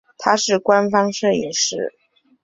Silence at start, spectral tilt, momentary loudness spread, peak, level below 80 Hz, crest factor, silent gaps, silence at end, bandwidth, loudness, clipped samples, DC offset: 0.2 s; -3 dB/octave; 6 LU; 0 dBFS; -62 dBFS; 18 dB; none; 0.55 s; 8 kHz; -18 LUFS; under 0.1%; under 0.1%